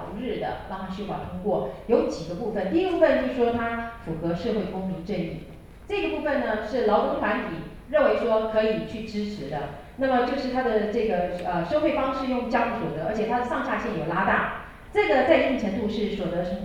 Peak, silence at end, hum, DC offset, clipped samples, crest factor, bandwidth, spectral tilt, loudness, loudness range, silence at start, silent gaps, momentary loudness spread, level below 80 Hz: -6 dBFS; 0 s; none; under 0.1%; under 0.1%; 18 dB; 13 kHz; -7 dB/octave; -26 LUFS; 3 LU; 0 s; none; 11 LU; -46 dBFS